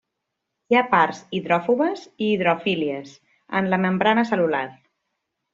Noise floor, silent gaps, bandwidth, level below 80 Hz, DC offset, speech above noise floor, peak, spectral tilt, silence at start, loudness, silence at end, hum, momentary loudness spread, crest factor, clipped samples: -80 dBFS; none; 7.6 kHz; -66 dBFS; under 0.1%; 59 dB; -4 dBFS; -6.5 dB/octave; 0.7 s; -21 LUFS; 0.8 s; none; 8 LU; 18 dB; under 0.1%